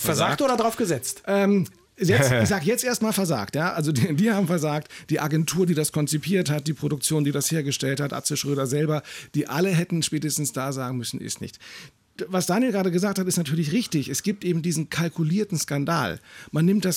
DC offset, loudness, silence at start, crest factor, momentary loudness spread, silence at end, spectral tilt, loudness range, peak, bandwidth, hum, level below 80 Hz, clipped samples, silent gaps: under 0.1%; -24 LUFS; 0 s; 14 dB; 8 LU; 0 s; -5 dB/octave; 4 LU; -8 dBFS; 17 kHz; none; -60 dBFS; under 0.1%; none